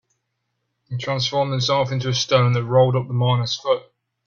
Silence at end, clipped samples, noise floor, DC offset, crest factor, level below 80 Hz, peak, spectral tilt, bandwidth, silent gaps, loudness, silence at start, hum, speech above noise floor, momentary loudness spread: 0.45 s; under 0.1%; -75 dBFS; under 0.1%; 18 dB; -58 dBFS; -4 dBFS; -5.5 dB/octave; 7.2 kHz; none; -20 LUFS; 0.9 s; none; 56 dB; 7 LU